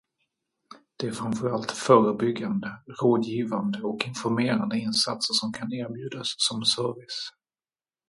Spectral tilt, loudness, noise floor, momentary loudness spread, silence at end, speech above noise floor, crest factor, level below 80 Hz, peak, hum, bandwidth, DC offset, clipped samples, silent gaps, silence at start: -4.5 dB/octave; -26 LUFS; under -90 dBFS; 13 LU; 0.8 s; over 64 dB; 24 dB; -68 dBFS; -4 dBFS; none; 11.5 kHz; under 0.1%; under 0.1%; none; 0.7 s